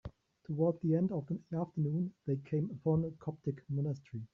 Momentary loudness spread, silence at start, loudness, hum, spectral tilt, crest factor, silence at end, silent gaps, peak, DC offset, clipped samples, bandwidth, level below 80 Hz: 8 LU; 0.05 s; -36 LUFS; none; -12 dB/octave; 16 dB; 0.1 s; none; -20 dBFS; under 0.1%; under 0.1%; 5.8 kHz; -66 dBFS